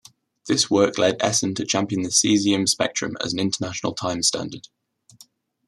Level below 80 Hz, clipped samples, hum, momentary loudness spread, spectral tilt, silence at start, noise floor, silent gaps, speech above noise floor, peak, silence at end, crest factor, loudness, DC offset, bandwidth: -62 dBFS; under 0.1%; none; 8 LU; -3 dB/octave; 0.45 s; -54 dBFS; none; 32 dB; -4 dBFS; 1 s; 20 dB; -21 LUFS; under 0.1%; 13.5 kHz